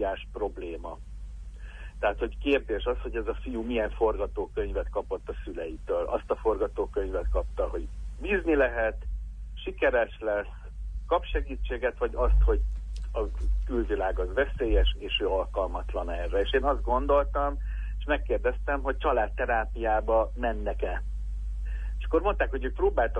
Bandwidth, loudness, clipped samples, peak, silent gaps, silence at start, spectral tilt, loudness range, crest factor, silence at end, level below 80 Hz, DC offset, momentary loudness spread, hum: 3.7 kHz; -29 LUFS; under 0.1%; -12 dBFS; none; 0 s; -7.5 dB/octave; 3 LU; 16 dB; 0 s; -32 dBFS; under 0.1%; 12 LU; none